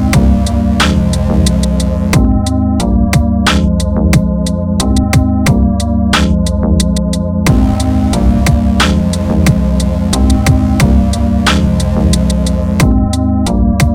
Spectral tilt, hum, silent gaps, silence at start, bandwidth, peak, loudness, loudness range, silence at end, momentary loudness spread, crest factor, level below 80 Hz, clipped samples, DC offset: -6 dB/octave; none; none; 0 s; 16.5 kHz; 0 dBFS; -11 LUFS; 1 LU; 0 s; 3 LU; 10 dB; -14 dBFS; 0.3%; under 0.1%